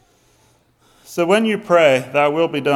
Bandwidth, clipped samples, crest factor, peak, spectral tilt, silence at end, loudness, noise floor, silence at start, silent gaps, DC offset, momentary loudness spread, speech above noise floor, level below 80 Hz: 15 kHz; under 0.1%; 16 dB; -2 dBFS; -5 dB/octave; 0 s; -16 LUFS; -57 dBFS; 1.1 s; none; under 0.1%; 7 LU; 41 dB; -64 dBFS